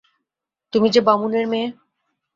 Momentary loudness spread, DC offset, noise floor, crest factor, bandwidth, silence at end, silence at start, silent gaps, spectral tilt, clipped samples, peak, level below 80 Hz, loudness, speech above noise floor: 9 LU; under 0.1%; -84 dBFS; 20 dB; 7.6 kHz; 0.65 s; 0.75 s; none; -5.5 dB/octave; under 0.1%; -2 dBFS; -64 dBFS; -19 LUFS; 66 dB